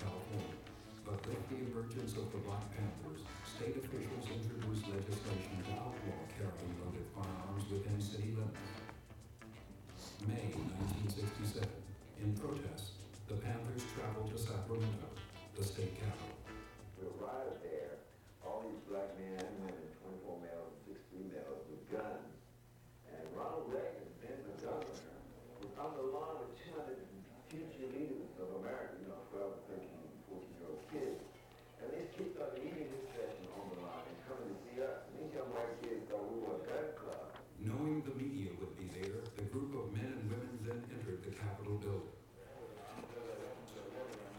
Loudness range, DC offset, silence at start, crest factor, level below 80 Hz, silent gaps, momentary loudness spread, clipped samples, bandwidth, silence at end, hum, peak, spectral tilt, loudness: 5 LU; under 0.1%; 0 s; 18 dB; -64 dBFS; none; 11 LU; under 0.1%; 18 kHz; 0 s; none; -28 dBFS; -6.5 dB/octave; -46 LUFS